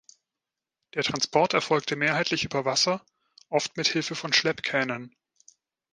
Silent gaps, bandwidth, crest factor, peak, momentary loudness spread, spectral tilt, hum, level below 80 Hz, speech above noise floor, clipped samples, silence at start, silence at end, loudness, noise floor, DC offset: none; 11 kHz; 22 dB; -6 dBFS; 7 LU; -3 dB/octave; none; -66 dBFS; 62 dB; under 0.1%; 0.95 s; 0.85 s; -25 LUFS; -88 dBFS; under 0.1%